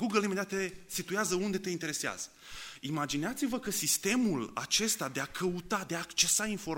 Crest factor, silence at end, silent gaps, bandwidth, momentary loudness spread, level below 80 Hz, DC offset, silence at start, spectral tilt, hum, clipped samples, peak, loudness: 22 dB; 0 s; none; 16.5 kHz; 9 LU; -62 dBFS; under 0.1%; 0 s; -2.5 dB/octave; none; under 0.1%; -12 dBFS; -32 LUFS